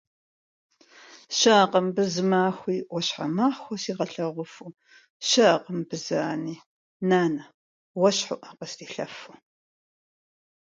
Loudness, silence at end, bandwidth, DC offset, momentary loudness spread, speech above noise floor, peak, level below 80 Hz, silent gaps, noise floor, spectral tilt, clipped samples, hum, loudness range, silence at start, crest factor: -25 LUFS; 1.35 s; 9.4 kHz; under 0.1%; 18 LU; 27 dB; -4 dBFS; -74 dBFS; 5.10-5.20 s, 6.66-7.00 s, 7.54-7.95 s; -51 dBFS; -4 dB/octave; under 0.1%; none; 4 LU; 1.15 s; 22 dB